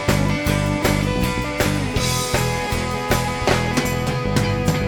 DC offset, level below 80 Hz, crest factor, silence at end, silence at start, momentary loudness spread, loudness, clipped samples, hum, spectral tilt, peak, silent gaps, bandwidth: under 0.1%; -30 dBFS; 18 dB; 0 s; 0 s; 3 LU; -20 LUFS; under 0.1%; none; -5 dB/octave; -2 dBFS; none; 19 kHz